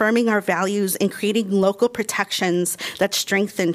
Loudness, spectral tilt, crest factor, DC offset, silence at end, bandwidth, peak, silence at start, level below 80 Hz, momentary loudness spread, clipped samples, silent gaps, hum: -20 LUFS; -4 dB/octave; 16 dB; under 0.1%; 0 s; 15.5 kHz; -4 dBFS; 0 s; -66 dBFS; 3 LU; under 0.1%; none; none